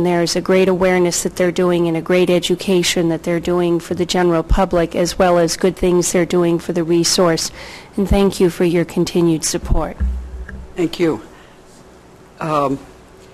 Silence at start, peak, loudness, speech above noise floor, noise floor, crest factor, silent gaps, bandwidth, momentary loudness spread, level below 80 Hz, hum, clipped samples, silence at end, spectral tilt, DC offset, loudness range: 0 s; -4 dBFS; -16 LUFS; 27 dB; -43 dBFS; 14 dB; none; 14.5 kHz; 9 LU; -30 dBFS; none; under 0.1%; 0.4 s; -5 dB/octave; under 0.1%; 7 LU